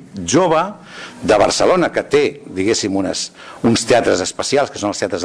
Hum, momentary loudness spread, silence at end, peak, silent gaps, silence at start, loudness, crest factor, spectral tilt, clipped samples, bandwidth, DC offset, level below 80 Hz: none; 10 LU; 0 s; -4 dBFS; none; 0 s; -16 LUFS; 12 dB; -4 dB/octave; under 0.1%; 11 kHz; under 0.1%; -46 dBFS